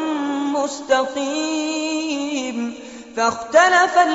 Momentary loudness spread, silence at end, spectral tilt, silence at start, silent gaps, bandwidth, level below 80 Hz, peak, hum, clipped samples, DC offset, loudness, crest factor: 13 LU; 0 s; -0.5 dB/octave; 0 s; none; 8 kHz; -60 dBFS; -2 dBFS; none; under 0.1%; under 0.1%; -19 LUFS; 18 dB